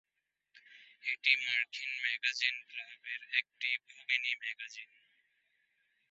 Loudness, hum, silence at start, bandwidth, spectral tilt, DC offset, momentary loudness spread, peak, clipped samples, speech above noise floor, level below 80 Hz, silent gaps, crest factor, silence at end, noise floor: -34 LUFS; none; 0.55 s; 8 kHz; 7 dB/octave; under 0.1%; 15 LU; -12 dBFS; under 0.1%; 48 dB; under -90 dBFS; none; 26 dB; 1.25 s; -84 dBFS